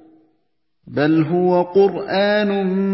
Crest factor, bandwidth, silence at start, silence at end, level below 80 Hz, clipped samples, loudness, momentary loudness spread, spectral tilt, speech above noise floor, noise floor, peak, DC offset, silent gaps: 14 dB; 5.8 kHz; 0.85 s; 0 s; -60 dBFS; under 0.1%; -17 LUFS; 3 LU; -11.5 dB/octave; 54 dB; -71 dBFS; -4 dBFS; under 0.1%; none